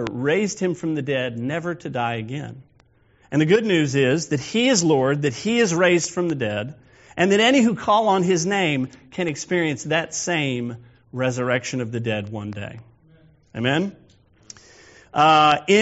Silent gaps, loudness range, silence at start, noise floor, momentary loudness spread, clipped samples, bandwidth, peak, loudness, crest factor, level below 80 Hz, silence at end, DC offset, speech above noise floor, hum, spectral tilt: none; 7 LU; 0 s; -57 dBFS; 15 LU; under 0.1%; 8 kHz; -2 dBFS; -21 LUFS; 20 dB; -60 dBFS; 0 s; under 0.1%; 37 dB; none; -4 dB/octave